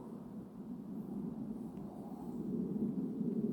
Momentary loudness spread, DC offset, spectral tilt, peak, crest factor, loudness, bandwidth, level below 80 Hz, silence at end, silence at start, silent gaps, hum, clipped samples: 10 LU; under 0.1%; -10.5 dB/octave; -26 dBFS; 16 dB; -42 LUFS; 18 kHz; -68 dBFS; 0 s; 0 s; none; none; under 0.1%